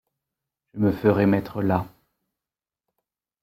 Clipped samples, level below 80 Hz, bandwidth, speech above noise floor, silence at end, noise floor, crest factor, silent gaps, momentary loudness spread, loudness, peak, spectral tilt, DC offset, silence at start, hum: under 0.1%; -56 dBFS; 15.5 kHz; over 69 dB; 1.55 s; under -90 dBFS; 20 dB; none; 15 LU; -23 LUFS; -6 dBFS; -9.5 dB/octave; under 0.1%; 0.75 s; none